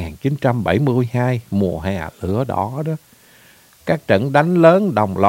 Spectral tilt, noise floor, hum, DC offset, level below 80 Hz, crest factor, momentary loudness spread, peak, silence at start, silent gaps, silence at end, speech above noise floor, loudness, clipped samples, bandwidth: -8 dB/octave; -49 dBFS; none; under 0.1%; -46 dBFS; 18 dB; 13 LU; 0 dBFS; 0 s; none; 0 s; 32 dB; -18 LUFS; under 0.1%; 16.5 kHz